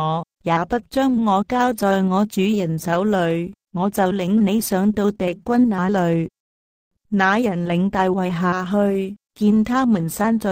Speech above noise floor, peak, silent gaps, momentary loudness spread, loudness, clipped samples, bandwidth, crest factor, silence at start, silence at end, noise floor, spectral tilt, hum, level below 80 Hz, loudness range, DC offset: over 71 dB; -4 dBFS; 6.40-6.91 s; 6 LU; -20 LUFS; under 0.1%; 16 kHz; 14 dB; 0 s; 0 s; under -90 dBFS; -6.5 dB/octave; none; -50 dBFS; 1 LU; under 0.1%